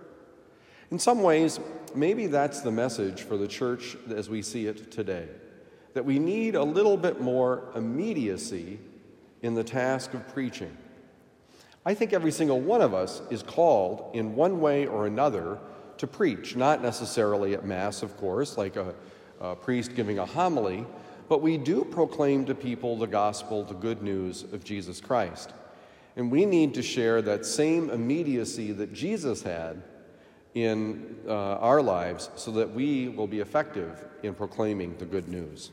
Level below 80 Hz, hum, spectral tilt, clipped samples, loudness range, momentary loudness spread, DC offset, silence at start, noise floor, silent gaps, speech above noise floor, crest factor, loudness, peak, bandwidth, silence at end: -70 dBFS; none; -5.5 dB/octave; under 0.1%; 5 LU; 13 LU; under 0.1%; 0 s; -57 dBFS; none; 30 dB; 18 dB; -28 LUFS; -10 dBFS; 16 kHz; 0 s